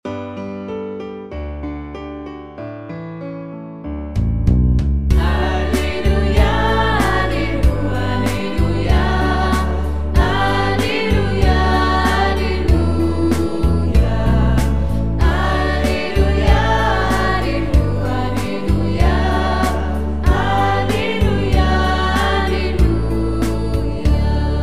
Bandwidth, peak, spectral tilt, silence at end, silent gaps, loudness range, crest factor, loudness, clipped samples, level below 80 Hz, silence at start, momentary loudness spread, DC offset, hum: 14.5 kHz; 0 dBFS; -6.5 dB/octave; 0 s; none; 5 LU; 16 dB; -17 LUFS; under 0.1%; -20 dBFS; 0 s; 13 LU; 4%; none